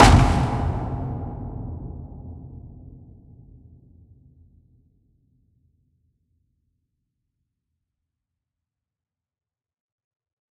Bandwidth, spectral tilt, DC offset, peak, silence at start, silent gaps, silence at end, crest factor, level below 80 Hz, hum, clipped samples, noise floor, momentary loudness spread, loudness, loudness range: 14 kHz; -5.5 dB/octave; under 0.1%; 0 dBFS; 0 s; none; 7.55 s; 26 dB; -34 dBFS; none; under 0.1%; -90 dBFS; 26 LU; -23 LUFS; 25 LU